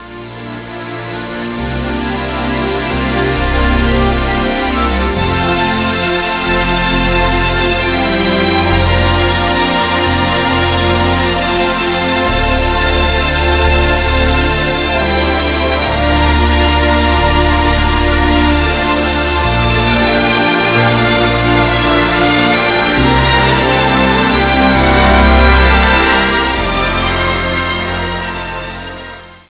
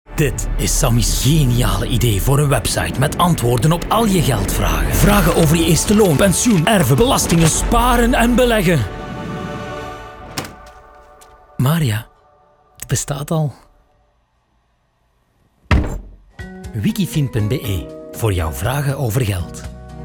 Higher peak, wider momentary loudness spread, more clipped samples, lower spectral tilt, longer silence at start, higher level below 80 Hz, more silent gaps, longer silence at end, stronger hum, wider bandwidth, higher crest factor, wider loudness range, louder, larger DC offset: about the same, -2 dBFS vs 0 dBFS; second, 8 LU vs 15 LU; neither; first, -9.5 dB/octave vs -5 dB/octave; about the same, 0 s vs 0.1 s; first, -18 dBFS vs -26 dBFS; neither; first, 0.2 s vs 0 s; neither; second, 4 kHz vs 19.5 kHz; second, 10 dB vs 16 dB; second, 5 LU vs 12 LU; first, -12 LUFS vs -16 LUFS; neither